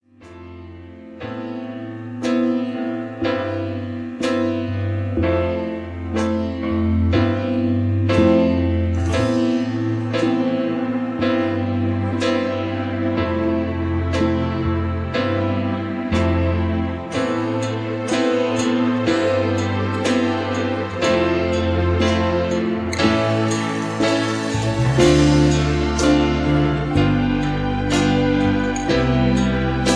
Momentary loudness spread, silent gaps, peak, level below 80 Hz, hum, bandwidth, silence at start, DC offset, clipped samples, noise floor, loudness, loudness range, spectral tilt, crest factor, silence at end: 8 LU; none; -2 dBFS; -34 dBFS; none; 11 kHz; 0.2 s; under 0.1%; under 0.1%; -40 dBFS; -20 LUFS; 5 LU; -6.5 dB/octave; 18 dB; 0 s